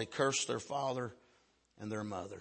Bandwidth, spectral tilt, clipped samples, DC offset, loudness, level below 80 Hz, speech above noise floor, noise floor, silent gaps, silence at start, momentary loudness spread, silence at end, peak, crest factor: 8.8 kHz; -3.5 dB/octave; under 0.1%; under 0.1%; -37 LUFS; -76 dBFS; 34 dB; -71 dBFS; none; 0 s; 12 LU; 0 s; -18 dBFS; 20 dB